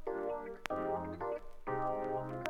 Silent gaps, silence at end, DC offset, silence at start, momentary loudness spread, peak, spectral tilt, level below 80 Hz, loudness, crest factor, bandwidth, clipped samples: none; 0 s; under 0.1%; 0 s; 5 LU; -16 dBFS; -6.5 dB/octave; -56 dBFS; -39 LUFS; 22 dB; 16.5 kHz; under 0.1%